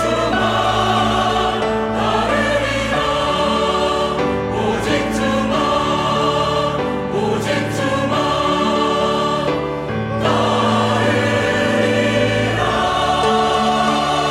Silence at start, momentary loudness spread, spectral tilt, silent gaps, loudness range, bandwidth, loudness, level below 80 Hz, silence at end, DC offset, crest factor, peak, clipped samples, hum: 0 s; 3 LU; -5 dB/octave; none; 2 LU; 15.5 kHz; -17 LUFS; -38 dBFS; 0 s; under 0.1%; 14 dB; -4 dBFS; under 0.1%; none